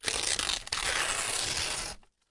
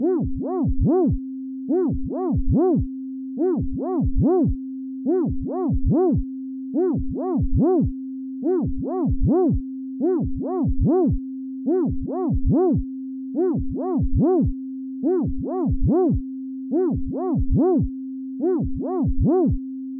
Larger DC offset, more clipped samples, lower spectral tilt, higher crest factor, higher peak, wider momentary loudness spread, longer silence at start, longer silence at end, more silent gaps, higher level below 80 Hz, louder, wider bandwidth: neither; neither; second, 0 dB/octave vs -17 dB/octave; first, 22 dB vs 10 dB; about the same, -10 dBFS vs -10 dBFS; second, 7 LU vs 11 LU; about the same, 0.05 s vs 0 s; first, 0.25 s vs 0 s; neither; second, -50 dBFS vs -30 dBFS; second, -29 LUFS vs -23 LUFS; first, 11.5 kHz vs 2 kHz